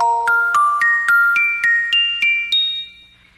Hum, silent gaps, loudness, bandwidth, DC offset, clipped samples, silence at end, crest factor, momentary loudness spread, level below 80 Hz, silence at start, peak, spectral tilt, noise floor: none; none; -14 LUFS; 14.5 kHz; under 0.1%; under 0.1%; 0.45 s; 12 dB; 4 LU; -58 dBFS; 0 s; -4 dBFS; 1.5 dB/octave; -45 dBFS